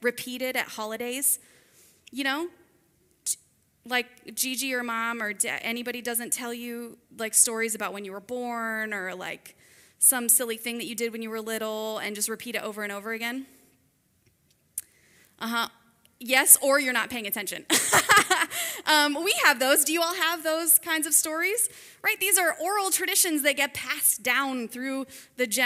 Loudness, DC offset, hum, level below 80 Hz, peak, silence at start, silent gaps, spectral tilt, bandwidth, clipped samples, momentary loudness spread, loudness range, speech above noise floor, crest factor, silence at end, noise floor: -24 LUFS; under 0.1%; none; -70 dBFS; -2 dBFS; 0 s; none; -0.5 dB/octave; 16 kHz; under 0.1%; 14 LU; 11 LU; 41 dB; 26 dB; 0 s; -67 dBFS